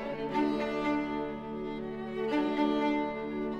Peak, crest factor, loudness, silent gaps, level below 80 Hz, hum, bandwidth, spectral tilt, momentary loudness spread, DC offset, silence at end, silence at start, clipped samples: -16 dBFS; 16 dB; -32 LUFS; none; -56 dBFS; none; 7.8 kHz; -6.5 dB/octave; 9 LU; under 0.1%; 0 s; 0 s; under 0.1%